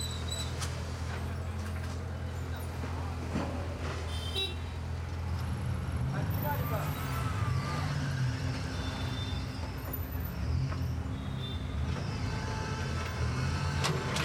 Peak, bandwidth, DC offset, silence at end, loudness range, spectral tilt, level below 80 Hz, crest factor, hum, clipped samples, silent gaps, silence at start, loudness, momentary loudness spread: -18 dBFS; 16.5 kHz; under 0.1%; 0 s; 4 LU; -5.5 dB/octave; -42 dBFS; 16 dB; none; under 0.1%; none; 0 s; -35 LUFS; 5 LU